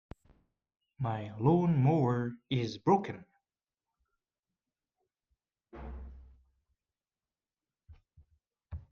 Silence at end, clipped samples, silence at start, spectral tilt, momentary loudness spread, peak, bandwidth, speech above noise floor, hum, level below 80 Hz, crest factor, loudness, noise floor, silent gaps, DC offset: 0.1 s; under 0.1%; 1 s; -8.5 dB/octave; 22 LU; -14 dBFS; 7 kHz; over 60 dB; none; -58 dBFS; 20 dB; -31 LUFS; under -90 dBFS; none; under 0.1%